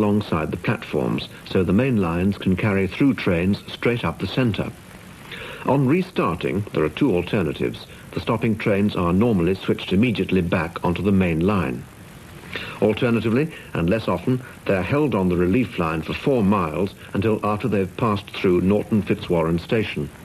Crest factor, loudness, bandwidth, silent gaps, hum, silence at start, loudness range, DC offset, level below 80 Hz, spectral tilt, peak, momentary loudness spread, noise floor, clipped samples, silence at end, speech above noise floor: 14 dB; -22 LUFS; 14 kHz; none; none; 0 s; 2 LU; under 0.1%; -46 dBFS; -7.5 dB/octave; -6 dBFS; 9 LU; -41 dBFS; under 0.1%; 0 s; 20 dB